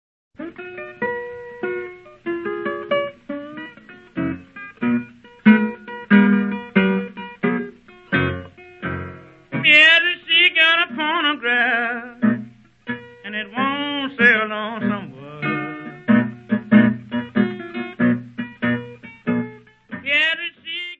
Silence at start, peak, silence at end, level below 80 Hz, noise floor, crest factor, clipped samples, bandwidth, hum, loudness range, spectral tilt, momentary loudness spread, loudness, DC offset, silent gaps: 0.4 s; 0 dBFS; 0.05 s; -60 dBFS; -43 dBFS; 20 dB; under 0.1%; 7.8 kHz; none; 12 LU; -6.5 dB/octave; 19 LU; -19 LUFS; under 0.1%; none